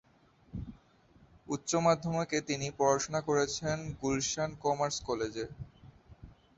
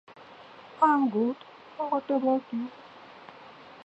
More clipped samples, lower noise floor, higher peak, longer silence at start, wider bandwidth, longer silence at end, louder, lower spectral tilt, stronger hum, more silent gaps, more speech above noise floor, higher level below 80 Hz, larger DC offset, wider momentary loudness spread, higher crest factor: neither; first, -65 dBFS vs -49 dBFS; second, -14 dBFS vs -8 dBFS; first, 0.55 s vs 0.2 s; about the same, 8.2 kHz vs 8 kHz; first, 0.25 s vs 0 s; second, -32 LUFS vs -27 LUFS; second, -4 dB/octave vs -7.5 dB/octave; neither; neither; first, 33 dB vs 23 dB; first, -58 dBFS vs -80 dBFS; neither; second, 16 LU vs 25 LU; about the same, 20 dB vs 20 dB